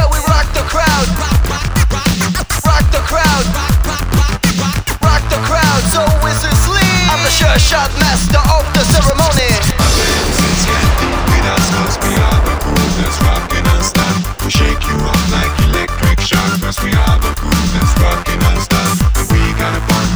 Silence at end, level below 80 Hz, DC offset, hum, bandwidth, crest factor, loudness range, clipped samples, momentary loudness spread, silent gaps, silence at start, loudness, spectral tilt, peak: 0 s; -16 dBFS; 0.4%; none; over 20 kHz; 12 dB; 3 LU; under 0.1%; 4 LU; none; 0 s; -12 LUFS; -4 dB/octave; 0 dBFS